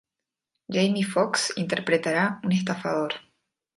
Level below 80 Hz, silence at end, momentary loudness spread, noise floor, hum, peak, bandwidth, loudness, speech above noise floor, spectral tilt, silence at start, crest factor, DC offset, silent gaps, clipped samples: -70 dBFS; 0.55 s; 5 LU; -87 dBFS; none; -8 dBFS; 11.5 kHz; -25 LUFS; 62 dB; -4.5 dB/octave; 0.7 s; 18 dB; under 0.1%; none; under 0.1%